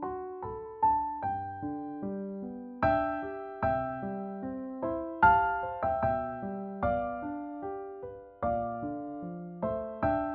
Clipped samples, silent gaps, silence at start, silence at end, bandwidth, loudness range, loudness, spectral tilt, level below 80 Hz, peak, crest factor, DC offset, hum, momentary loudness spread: under 0.1%; none; 0 s; 0 s; 5 kHz; 6 LU; -32 LUFS; -6.5 dB/octave; -52 dBFS; -10 dBFS; 22 dB; under 0.1%; none; 12 LU